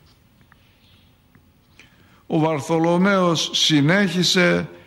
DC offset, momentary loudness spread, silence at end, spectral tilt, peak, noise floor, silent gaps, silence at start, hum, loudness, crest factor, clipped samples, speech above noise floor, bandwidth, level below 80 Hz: under 0.1%; 5 LU; 0.1 s; -4.5 dB/octave; -6 dBFS; -55 dBFS; none; 2.3 s; none; -18 LUFS; 16 dB; under 0.1%; 37 dB; 13.5 kHz; -60 dBFS